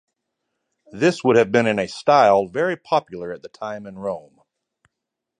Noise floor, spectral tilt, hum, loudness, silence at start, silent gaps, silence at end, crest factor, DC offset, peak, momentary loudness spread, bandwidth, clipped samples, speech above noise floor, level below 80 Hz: -83 dBFS; -5.5 dB/octave; none; -19 LUFS; 0.95 s; none; 1.2 s; 20 dB; under 0.1%; -2 dBFS; 17 LU; 10 kHz; under 0.1%; 63 dB; -62 dBFS